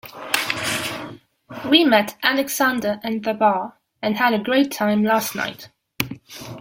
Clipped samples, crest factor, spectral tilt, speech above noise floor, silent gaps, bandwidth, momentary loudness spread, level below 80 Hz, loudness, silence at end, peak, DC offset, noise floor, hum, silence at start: under 0.1%; 22 dB; -3.5 dB/octave; 20 dB; none; 16.5 kHz; 16 LU; -60 dBFS; -20 LUFS; 0 s; 0 dBFS; under 0.1%; -40 dBFS; none; 0.05 s